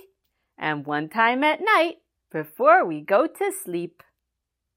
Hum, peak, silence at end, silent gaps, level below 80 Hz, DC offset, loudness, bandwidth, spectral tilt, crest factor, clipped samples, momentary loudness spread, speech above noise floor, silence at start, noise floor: none; -4 dBFS; 0.9 s; none; -78 dBFS; under 0.1%; -22 LUFS; 16 kHz; -4 dB/octave; 20 dB; under 0.1%; 15 LU; 60 dB; 0.6 s; -82 dBFS